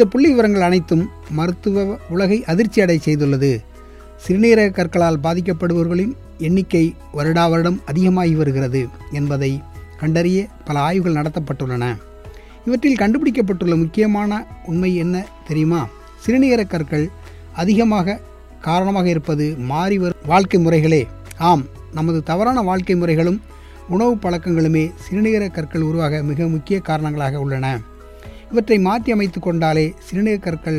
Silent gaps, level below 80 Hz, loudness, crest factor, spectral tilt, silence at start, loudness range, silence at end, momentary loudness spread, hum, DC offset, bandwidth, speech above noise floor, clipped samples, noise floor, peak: none; -40 dBFS; -18 LUFS; 16 dB; -7.5 dB/octave; 0 s; 3 LU; 0 s; 9 LU; none; under 0.1%; 13.5 kHz; 22 dB; under 0.1%; -39 dBFS; 0 dBFS